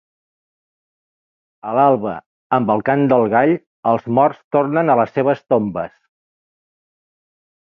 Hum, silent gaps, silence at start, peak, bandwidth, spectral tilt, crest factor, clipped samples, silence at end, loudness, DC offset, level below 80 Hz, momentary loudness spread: none; 2.26-2.50 s, 3.66-3.83 s, 4.44-4.51 s; 1.65 s; -2 dBFS; 5.8 kHz; -10 dB/octave; 18 dB; under 0.1%; 1.75 s; -17 LUFS; under 0.1%; -60 dBFS; 11 LU